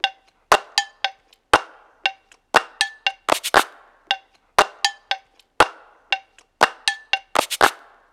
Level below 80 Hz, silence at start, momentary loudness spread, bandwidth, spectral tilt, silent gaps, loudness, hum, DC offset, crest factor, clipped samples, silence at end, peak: -54 dBFS; 0.05 s; 8 LU; 18 kHz; -1 dB/octave; none; -21 LUFS; none; under 0.1%; 22 dB; under 0.1%; 0.4 s; 0 dBFS